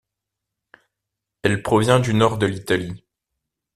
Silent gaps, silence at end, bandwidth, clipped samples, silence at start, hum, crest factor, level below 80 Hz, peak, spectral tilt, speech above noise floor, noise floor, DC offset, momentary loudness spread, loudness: none; 0.8 s; 14 kHz; under 0.1%; 1.45 s; none; 20 dB; -52 dBFS; -2 dBFS; -6 dB/octave; 64 dB; -83 dBFS; under 0.1%; 10 LU; -20 LUFS